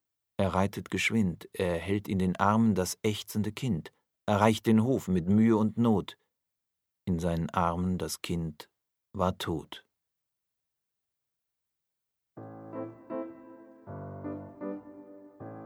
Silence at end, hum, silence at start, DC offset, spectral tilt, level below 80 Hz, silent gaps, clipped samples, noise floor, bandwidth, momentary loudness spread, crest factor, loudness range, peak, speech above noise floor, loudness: 0 s; none; 0.4 s; under 0.1%; -6 dB/octave; -56 dBFS; none; under 0.1%; -86 dBFS; 16 kHz; 20 LU; 24 dB; 18 LU; -6 dBFS; 58 dB; -29 LUFS